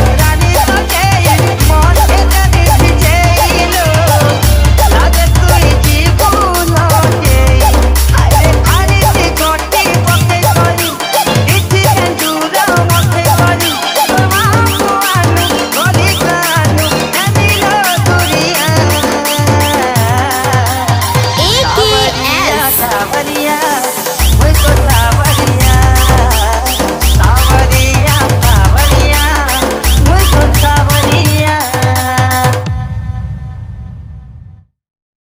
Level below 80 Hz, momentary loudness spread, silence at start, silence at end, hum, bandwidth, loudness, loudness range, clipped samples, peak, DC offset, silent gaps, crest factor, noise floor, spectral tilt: -14 dBFS; 4 LU; 0 s; 0.75 s; none; 16.5 kHz; -9 LUFS; 2 LU; under 0.1%; 0 dBFS; under 0.1%; none; 8 dB; -36 dBFS; -4 dB/octave